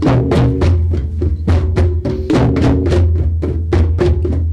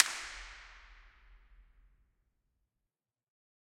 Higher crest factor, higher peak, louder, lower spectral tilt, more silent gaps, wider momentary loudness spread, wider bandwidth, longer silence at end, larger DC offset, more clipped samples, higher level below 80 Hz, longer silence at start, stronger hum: second, 12 dB vs 38 dB; first, 0 dBFS vs -4 dBFS; first, -14 LUFS vs -36 LUFS; first, -8.5 dB/octave vs 0.5 dB/octave; neither; second, 5 LU vs 24 LU; second, 7.8 kHz vs 16 kHz; second, 0 s vs 2.15 s; neither; neither; first, -18 dBFS vs -62 dBFS; about the same, 0 s vs 0 s; neither